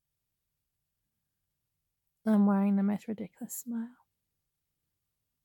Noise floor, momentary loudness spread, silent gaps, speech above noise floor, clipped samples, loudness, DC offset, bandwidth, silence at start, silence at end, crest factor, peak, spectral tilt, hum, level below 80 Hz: -84 dBFS; 15 LU; none; 55 dB; under 0.1%; -31 LUFS; under 0.1%; 17.5 kHz; 2.25 s; 1.55 s; 16 dB; -18 dBFS; -7.5 dB/octave; none; -86 dBFS